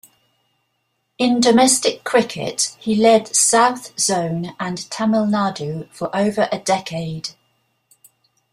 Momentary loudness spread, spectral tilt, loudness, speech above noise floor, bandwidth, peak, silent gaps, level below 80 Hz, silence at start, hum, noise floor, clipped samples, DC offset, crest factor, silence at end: 13 LU; -3.5 dB/octave; -18 LUFS; 53 dB; 15.5 kHz; -2 dBFS; none; -60 dBFS; 1.2 s; none; -71 dBFS; under 0.1%; under 0.1%; 18 dB; 1.2 s